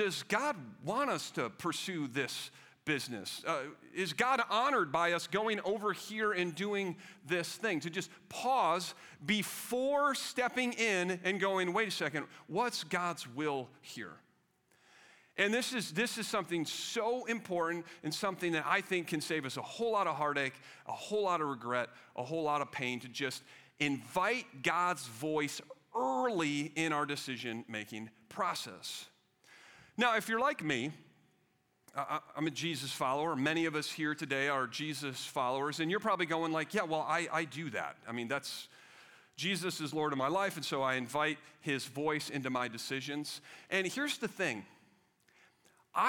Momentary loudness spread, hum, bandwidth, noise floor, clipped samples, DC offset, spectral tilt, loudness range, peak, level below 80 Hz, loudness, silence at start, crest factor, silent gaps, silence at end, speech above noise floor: 10 LU; none; 19 kHz; -75 dBFS; under 0.1%; under 0.1%; -3.5 dB/octave; 4 LU; -14 dBFS; -80 dBFS; -35 LUFS; 0 s; 22 dB; none; 0 s; 39 dB